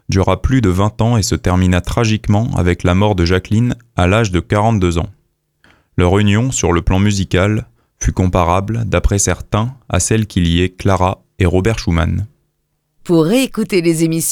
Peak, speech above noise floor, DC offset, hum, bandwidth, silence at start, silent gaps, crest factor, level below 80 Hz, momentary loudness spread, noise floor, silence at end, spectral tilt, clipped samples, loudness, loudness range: 0 dBFS; 53 dB; under 0.1%; none; 17.5 kHz; 0.1 s; none; 14 dB; -28 dBFS; 5 LU; -67 dBFS; 0 s; -5.5 dB/octave; under 0.1%; -15 LUFS; 2 LU